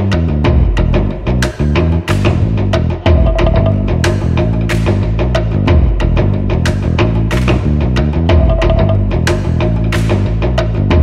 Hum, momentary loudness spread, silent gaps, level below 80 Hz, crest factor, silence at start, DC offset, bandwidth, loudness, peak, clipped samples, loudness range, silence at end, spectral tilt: none; 3 LU; none; -16 dBFS; 10 dB; 0 s; under 0.1%; 12.5 kHz; -13 LUFS; 0 dBFS; under 0.1%; 1 LU; 0 s; -7 dB/octave